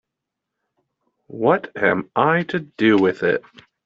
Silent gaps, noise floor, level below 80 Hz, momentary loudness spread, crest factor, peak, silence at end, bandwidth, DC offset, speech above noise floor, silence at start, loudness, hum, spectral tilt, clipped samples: none; -82 dBFS; -64 dBFS; 8 LU; 18 dB; -2 dBFS; 0.45 s; 7.4 kHz; under 0.1%; 63 dB; 1.3 s; -19 LUFS; none; -4.5 dB/octave; under 0.1%